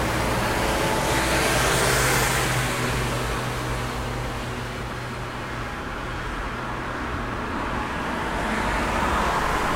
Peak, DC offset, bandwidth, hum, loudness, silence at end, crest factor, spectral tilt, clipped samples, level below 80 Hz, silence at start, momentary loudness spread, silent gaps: -8 dBFS; under 0.1%; 16 kHz; none; -24 LUFS; 0 s; 16 dB; -4 dB/octave; under 0.1%; -34 dBFS; 0 s; 11 LU; none